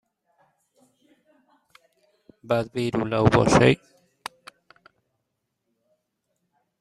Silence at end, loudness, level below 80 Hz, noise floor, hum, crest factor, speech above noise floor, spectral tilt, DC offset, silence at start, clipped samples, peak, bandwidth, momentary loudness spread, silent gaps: 3.05 s; -21 LUFS; -50 dBFS; -79 dBFS; none; 24 dB; 59 dB; -6 dB/octave; under 0.1%; 2.45 s; under 0.1%; -2 dBFS; 13 kHz; 22 LU; none